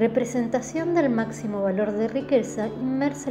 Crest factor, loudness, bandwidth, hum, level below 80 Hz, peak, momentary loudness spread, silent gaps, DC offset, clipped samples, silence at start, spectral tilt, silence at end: 16 dB; -25 LUFS; 13 kHz; none; -60 dBFS; -8 dBFS; 5 LU; none; under 0.1%; under 0.1%; 0 s; -6 dB/octave; 0 s